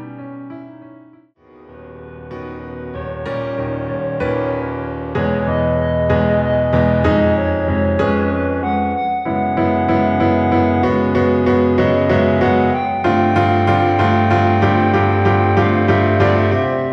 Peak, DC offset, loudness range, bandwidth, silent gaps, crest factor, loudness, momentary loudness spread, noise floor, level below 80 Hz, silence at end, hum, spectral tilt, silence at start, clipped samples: -2 dBFS; under 0.1%; 11 LU; 6.2 kHz; none; 14 dB; -16 LUFS; 15 LU; -47 dBFS; -36 dBFS; 0 s; none; -9 dB/octave; 0 s; under 0.1%